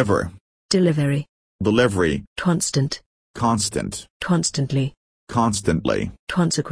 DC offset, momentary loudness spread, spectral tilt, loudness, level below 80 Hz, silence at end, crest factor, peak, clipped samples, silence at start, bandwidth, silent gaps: under 0.1%; 10 LU; -5 dB/octave; -22 LUFS; -44 dBFS; 0 s; 18 dB; -4 dBFS; under 0.1%; 0 s; 11 kHz; 0.41-0.69 s, 1.29-1.59 s, 2.27-2.36 s, 3.06-3.34 s, 4.10-4.20 s, 4.97-5.27 s, 6.19-6.27 s